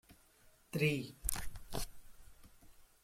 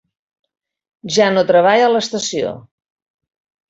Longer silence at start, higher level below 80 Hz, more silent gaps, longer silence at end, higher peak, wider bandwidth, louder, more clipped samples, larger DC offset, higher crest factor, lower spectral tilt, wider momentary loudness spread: second, 0.1 s vs 1.05 s; first, -52 dBFS vs -62 dBFS; neither; second, 0.2 s vs 1.1 s; second, -12 dBFS vs -2 dBFS; first, 16.5 kHz vs 8 kHz; second, -40 LUFS vs -15 LUFS; neither; neither; first, 28 dB vs 16 dB; about the same, -4.5 dB/octave vs -3.5 dB/octave; second, 11 LU vs 15 LU